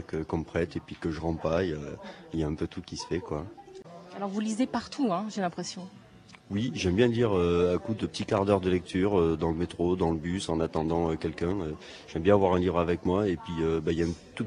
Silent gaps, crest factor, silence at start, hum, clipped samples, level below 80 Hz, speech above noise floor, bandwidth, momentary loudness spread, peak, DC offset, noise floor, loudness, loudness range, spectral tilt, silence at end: none; 22 dB; 0 s; none; under 0.1%; -48 dBFS; 25 dB; 10.5 kHz; 13 LU; -8 dBFS; under 0.1%; -53 dBFS; -29 LUFS; 7 LU; -6.5 dB/octave; 0 s